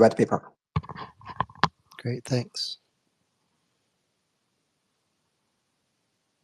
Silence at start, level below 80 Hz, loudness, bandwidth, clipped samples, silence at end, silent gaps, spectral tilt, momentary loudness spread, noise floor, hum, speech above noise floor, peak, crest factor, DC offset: 0 s; -58 dBFS; -29 LUFS; 13 kHz; under 0.1%; 3.7 s; none; -6 dB/octave; 15 LU; -76 dBFS; none; 51 dB; 0 dBFS; 30 dB; under 0.1%